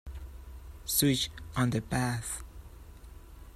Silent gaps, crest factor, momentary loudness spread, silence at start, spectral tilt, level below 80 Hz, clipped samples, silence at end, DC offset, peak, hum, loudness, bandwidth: none; 22 dB; 25 LU; 0.05 s; -4 dB/octave; -48 dBFS; under 0.1%; 0 s; under 0.1%; -12 dBFS; none; -30 LUFS; 15 kHz